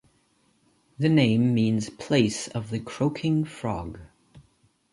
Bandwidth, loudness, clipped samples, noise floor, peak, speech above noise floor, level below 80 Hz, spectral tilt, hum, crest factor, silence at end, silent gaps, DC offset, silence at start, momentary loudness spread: 11.5 kHz; -25 LUFS; under 0.1%; -66 dBFS; -6 dBFS; 42 dB; -54 dBFS; -6 dB/octave; none; 20 dB; 0.55 s; none; under 0.1%; 1 s; 12 LU